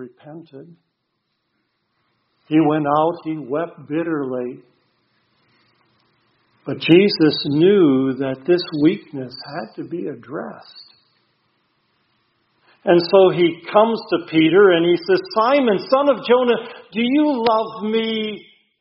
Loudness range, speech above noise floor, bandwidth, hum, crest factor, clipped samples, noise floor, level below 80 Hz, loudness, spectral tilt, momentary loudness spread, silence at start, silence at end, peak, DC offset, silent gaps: 12 LU; 55 dB; 5.8 kHz; none; 20 dB; under 0.1%; -73 dBFS; -64 dBFS; -17 LUFS; -4.5 dB/octave; 17 LU; 0 s; 0.4 s; 0 dBFS; under 0.1%; none